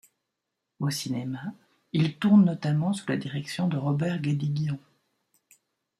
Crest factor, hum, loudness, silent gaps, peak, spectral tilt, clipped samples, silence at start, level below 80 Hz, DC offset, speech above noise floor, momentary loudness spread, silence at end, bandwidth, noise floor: 18 dB; none; -27 LUFS; none; -10 dBFS; -6.5 dB/octave; under 0.1%; 0.8 s; -68 dBFS; under 0.1%; 58 dB; 13 LU; 1.2 s; 13 kHz; -83 dBFS